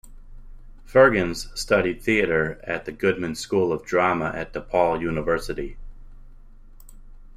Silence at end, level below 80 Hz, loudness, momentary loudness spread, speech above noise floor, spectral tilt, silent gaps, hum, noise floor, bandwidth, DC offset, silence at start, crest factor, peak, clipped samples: 0.1 s; -42 dBFS; -23 LUFS; 13 LU; 22 dB; -5.5 dB/octave; none; none; -44 dBFS; 15 kHz; under 0.1%; 0.05 s; 20 dB; -4 dBFS; under 0.1%